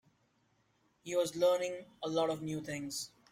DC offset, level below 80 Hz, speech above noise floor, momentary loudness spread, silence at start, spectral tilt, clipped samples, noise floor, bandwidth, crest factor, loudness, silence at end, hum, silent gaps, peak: under 0.1%; -74 dBFS; 40 dB; 11 LU; 1.05 s; -4 dB/octave; under 0.1%; -74 dBFS; 16 kHz; 18 dB; -35 LUFS; 0.25 s; none; none; -18 dBFS